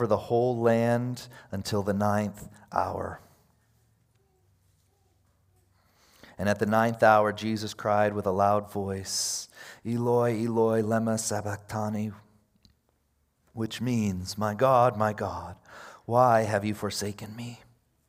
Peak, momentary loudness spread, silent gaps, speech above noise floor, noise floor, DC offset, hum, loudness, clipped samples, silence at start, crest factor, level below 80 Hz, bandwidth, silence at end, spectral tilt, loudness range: -6 dBFS; 17 LU; none; 45 dB; -72 dBFS; under 0.1%; none; -27 LUFS; under 0.1%; 0 s; 22 dB; -66 dBFS; 16 kHz; 0.5 s; -5.5 dB/octave; 8 LU